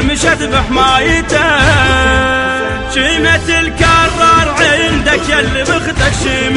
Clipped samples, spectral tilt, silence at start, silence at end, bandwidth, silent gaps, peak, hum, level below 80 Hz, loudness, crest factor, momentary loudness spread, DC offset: under 0.1%; -4 dB/octave; 0 s; 0 s; 11.5 kHz; none; 0 dBFS; none; -22 dBFS; -10 LUFS; 10 dB; 5 LU; 0.4%